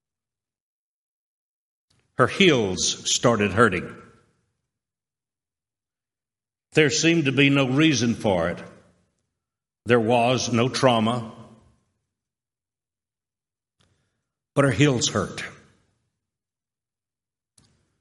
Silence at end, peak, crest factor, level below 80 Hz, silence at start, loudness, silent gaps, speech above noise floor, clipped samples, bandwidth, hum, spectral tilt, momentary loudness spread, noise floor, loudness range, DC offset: 2.5 s; -2 dBFS; 22 dB; -60 dBFS; 2.2 s; -21 LUFS; none; over 69 dB; under 0.1%; 11.5 kHz; none; -4.5 dB/octave; 13 LU; under -90 dBFS; 7 LU; under 0.1%